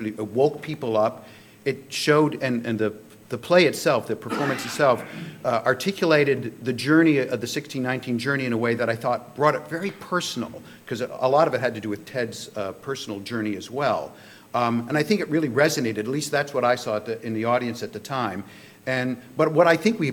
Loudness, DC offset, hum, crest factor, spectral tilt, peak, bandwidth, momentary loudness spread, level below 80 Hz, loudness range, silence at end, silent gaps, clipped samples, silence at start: -24 LUFS; under 0.1%; none; 20 dB; -5 dB/octave; -4 dBFS; 20 kHz; 12 LU; -68 dBFS; 4 LU; 0 s; none; under 0.1%; 0 s